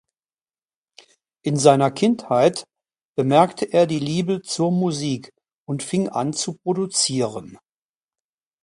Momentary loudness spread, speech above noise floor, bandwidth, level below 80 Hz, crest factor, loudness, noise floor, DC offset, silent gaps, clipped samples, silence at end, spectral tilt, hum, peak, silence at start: 12 LU; over 70 dB; 11.5 kHz; -64 dBFS; 22 dB; -21 LUFS; under -90 dBFS; under 0.1%; 3.05-3.15 s, 5.53-5.66 s; under 0.1%; 1.1 s; -5 dB/octave; none; 0 dBFS; 1.45 s